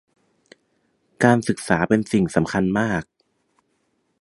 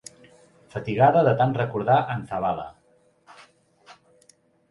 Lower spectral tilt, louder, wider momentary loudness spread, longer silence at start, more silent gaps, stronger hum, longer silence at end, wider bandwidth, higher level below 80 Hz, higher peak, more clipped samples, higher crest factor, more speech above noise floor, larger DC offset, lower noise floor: about the same, -6.5 dB/octave vs -7.5 dB/octave; about the same, -20 LUFS vs -22 LUFS; second, 4 LU vs 18 LU; first, 1.2 s vs 0.75 s; neither; neither; first, 1.15 s vs 0.8 s; about the same, 11.5 kHz vs 11.5 kHz; first, -50 dBFS vs -58 dBFS; first, 0 dBFS vs -6 dBFS; neither; about the same, 22 dB vs 20 dB; first, 50 dB vs 39 dB; neither; first, -69 dBFS vs -61 dBFS